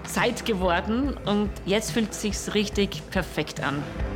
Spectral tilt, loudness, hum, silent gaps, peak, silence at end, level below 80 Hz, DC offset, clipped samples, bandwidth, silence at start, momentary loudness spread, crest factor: -4.5 dB/octave; -26 LUFS; none; none; -10 dBFS; 0 s; -38 dBFS; under 0.1%; under 0.1%; 17 kHz; 0 s; 5 LU; 16 dB